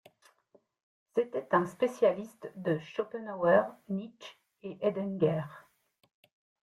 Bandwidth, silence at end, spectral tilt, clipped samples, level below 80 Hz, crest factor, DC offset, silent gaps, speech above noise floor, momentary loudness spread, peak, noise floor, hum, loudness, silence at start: 12.5 kHz; 1.1 s; -7.5 dB/octave; under 0.1%; -74 dBFS; 20 dB; under 0.1%; none; 37 dB; 19 LU; -12 dBFS; -68 dBFS; none; -31 LUFS; 1.15 s